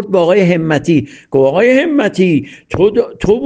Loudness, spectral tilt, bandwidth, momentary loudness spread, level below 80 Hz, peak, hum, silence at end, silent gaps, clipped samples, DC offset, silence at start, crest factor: -12 LUFS; -7 dB/octave; 9.2 kHz; 5 LU; -40 dBFS; 0 dBFS; none; 0 s; none; under 0.1%; under 0.1%; 0 s; 12 dB